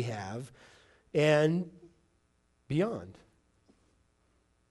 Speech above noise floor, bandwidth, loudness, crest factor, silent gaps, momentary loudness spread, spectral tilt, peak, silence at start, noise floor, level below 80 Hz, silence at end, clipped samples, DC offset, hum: 42 dB; 11.5 kHz; -30 LUFS; 20 dB; none; 19 LU; -6.5 dB/octave; -14 dBFS; 0 s; -72 dBFS; -68 dBFS; 1.6 s; under 0.1%; under 0.1%; none